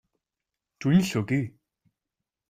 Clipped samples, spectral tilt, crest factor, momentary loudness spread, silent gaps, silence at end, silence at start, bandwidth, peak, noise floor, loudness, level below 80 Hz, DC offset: under 0.1%; -6.5 dB/octave; 18 dB; 10 LU; none; 1 s; 0.8 s; 15.5 kHz; -10 dBFS; -88 dBFS; -25 LUFS; -64 dBFS; under 0.1%